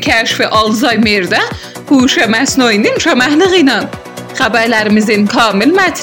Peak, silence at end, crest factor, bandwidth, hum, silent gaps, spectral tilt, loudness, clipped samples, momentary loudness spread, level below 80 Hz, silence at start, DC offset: 0 dBFS; 0 s; 10 dB; 17 kHz; none; none; -3.5 dB/octave; -10 LUFS; under 0.1%; 7 LU; -42 dBFS; 0 s; 0.2%